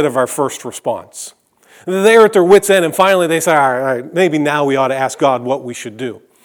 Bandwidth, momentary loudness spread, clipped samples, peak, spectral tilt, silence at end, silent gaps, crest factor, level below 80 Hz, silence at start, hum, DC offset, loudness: 19.5 kHz; 18 LU; 0.1%; 0 dBFS; -4.5 dB/octave; 0.25 s; none; 14 dB; -60 dBFS; 0 s; none; under 0.1%; -13 LUFS